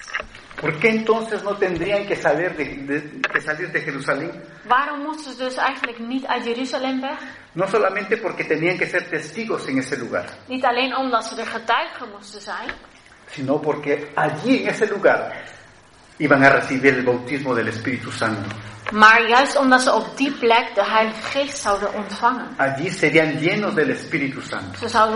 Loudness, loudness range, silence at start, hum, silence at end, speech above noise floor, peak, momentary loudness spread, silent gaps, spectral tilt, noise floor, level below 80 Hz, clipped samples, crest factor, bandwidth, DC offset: -20 LUFS; 7 LU; 0 s; none; 0 s; 28 dB; 0 dBFS; 14 LU; none; -4.5 dB/octave; -48 dBFS; -56 dBFS; under 0.1%; 20 dB; 10.5 kHz; under 0.1%